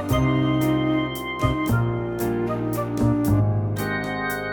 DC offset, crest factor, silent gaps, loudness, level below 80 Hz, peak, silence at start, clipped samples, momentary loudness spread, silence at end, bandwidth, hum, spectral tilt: under 0.1%; 14 dB; none; -23 LUFS; -38 dBFS; -8 dBFS; 0 s; under 0.1%; 5 LU; 0 s; over 20 kHz; none; -7 dB/octave